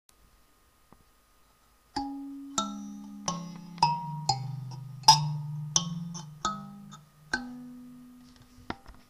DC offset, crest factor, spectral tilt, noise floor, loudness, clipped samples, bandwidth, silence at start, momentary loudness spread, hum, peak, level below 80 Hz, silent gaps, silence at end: under 0.1%; 28 dB; -2.5 dB/octave; -63 dBFS; -30 LUFS; under 0.1%; 15.5 kHz; 1.95 s; 22 LU; none; -4 dBFS; -60 dBFS; none; 0.1 s